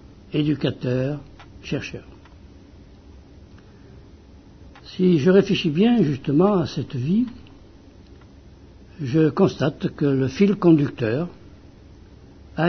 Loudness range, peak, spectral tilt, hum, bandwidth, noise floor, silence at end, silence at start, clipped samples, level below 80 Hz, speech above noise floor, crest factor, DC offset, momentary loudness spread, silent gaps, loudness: 12 LU; -4 dBFS; -8 dB/octave; none; 6.4 kHz; -47 dBFS; 0 s; 0.3 s; under 0.1%; -50 dBFS; 27 dB; 20 dB; under 0.1%; 15 LU; none; -21 LUFS